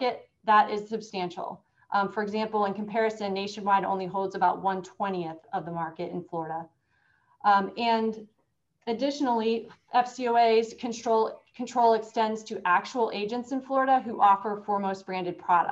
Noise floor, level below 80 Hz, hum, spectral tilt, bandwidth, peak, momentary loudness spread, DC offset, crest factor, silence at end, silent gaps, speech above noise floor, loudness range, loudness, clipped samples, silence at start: -75 dBFS; -74 dBFS; none; -5 dB/octave; 8 kHz; -10 dBFS; 12 LU; under 0.1%; 18 dB; 0 s; none; 48 dB; 4 LU; -27 LUFS; under 0.1%; 0 s